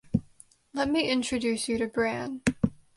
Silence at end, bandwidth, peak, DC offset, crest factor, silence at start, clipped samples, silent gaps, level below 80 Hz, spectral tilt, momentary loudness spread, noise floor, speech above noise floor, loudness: 0.2 s; 11.5 kHz; -8 dBFS; under 0.1%; 20 dB; 0.1 s; under 0.1%; none; -50 dBFS; -4.5 dB/octave; 6 LU; -57 dBFS; 30 dB; -29 LUFS